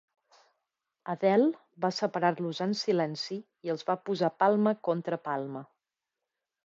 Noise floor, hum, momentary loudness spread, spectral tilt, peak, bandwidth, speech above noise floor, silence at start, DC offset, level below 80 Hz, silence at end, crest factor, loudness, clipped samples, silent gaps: -88 dBFS; none; 12 LU; -6 dB/octave; -12 dBFS; 7.8 kHz; 59 dB; 1.05 s; under 0.1%; -84 dBFS; 1 s; 18 dB; -30 LUFS; under 0.1%; none